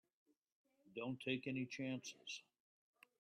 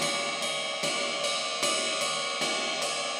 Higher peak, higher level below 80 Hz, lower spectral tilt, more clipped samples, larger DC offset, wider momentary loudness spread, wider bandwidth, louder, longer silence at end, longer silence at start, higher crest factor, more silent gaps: second, -28 dBFS vs -14 dBFS; about the same, -88 dBFS vs under -90 dBFS; first, -4.5 dB/octave vs -0.5 dB/octave; neither; neither; first, 9 LU vs 2 LU; second, 13 kHz vs over 20 kHz; second, -47 LUFS vs -28 LUFS; first, 0.8 s vs 0 s; first, 0.85 s vs 0 s; first, 22 dB vs 16 dB; neither